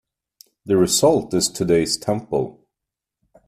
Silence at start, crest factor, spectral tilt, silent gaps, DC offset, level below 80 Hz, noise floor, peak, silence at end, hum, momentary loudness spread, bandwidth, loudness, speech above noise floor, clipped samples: 0.65 s; 18 dB; -4 dB/octave; none; under 0.1%; -52 dBFS; -85 dBFS; -4 dBFS; 0.95 s; none; 9 LU; 15.5 kHz; -19 LUFS; 66 dB; under 0.1%